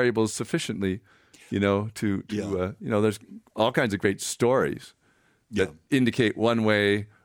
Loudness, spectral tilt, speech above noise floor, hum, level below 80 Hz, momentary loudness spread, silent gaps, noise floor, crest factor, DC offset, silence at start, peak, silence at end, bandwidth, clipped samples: -26 LUFS; -5 dB/octave; 40 dB; none; -60 dBFS; 8 LU; none; -65 dBFS; 18 dB; under 0.1%; 0 s; -6 dBFS; 0.2 s; 19 kHz; under 0.1%